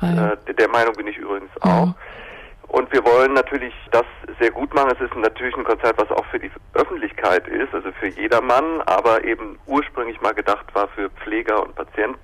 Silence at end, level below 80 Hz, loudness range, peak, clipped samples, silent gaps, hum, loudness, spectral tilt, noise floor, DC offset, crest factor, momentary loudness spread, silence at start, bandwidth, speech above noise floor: 0.05 s; -44 dBFS; 2 LU; -8 dBFS; under 0.1%; none; none; -20 LUFS; -7 dB/octave; -39 dBFS; under 0.1%; 12 dB; 11 LU; 0 s; 13 kHz; 19 dB